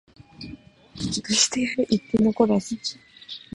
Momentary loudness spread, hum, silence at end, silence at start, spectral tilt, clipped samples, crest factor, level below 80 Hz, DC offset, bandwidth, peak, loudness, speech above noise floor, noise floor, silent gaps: 21 LU; none; 0.15 s; 0.4 s; -3.5 dB/octave; under 0.1%; 20 dB; -54 dBFS; under 0.1%; 11.5 kHz; -6 dBFS; -23 LUFS; 21 dB; -44 dBFS; none